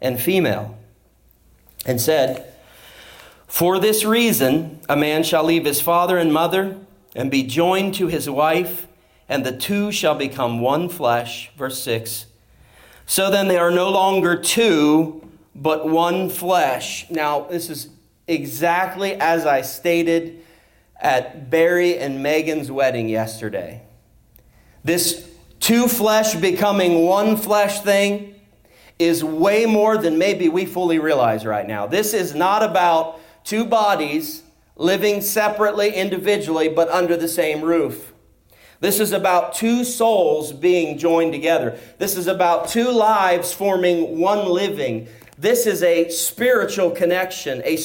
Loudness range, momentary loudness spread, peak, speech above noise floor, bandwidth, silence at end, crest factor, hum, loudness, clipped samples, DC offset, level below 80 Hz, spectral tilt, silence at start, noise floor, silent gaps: 4 LU; 10 LU; -6 dBFS; 37 dB; 17 kHz; 0 s; 14 dB; none; -19 LUFS; under 0.1%; under 0.1%; -58 dBFS; -4 dB/octave; 0 s; -56 dBFS; none